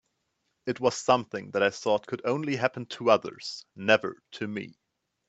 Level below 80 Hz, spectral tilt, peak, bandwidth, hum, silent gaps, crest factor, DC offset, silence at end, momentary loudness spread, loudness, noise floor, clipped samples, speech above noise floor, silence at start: -72 dBFS; -4.5 dB/octave; -4 dBFS; 8.4 kHz; none; none; 24 dB; under 0.1%; 0.6 s; 14 LU; -28 LUFS; -78 dBFS; under 0.1%; 50 dB; 0.65 s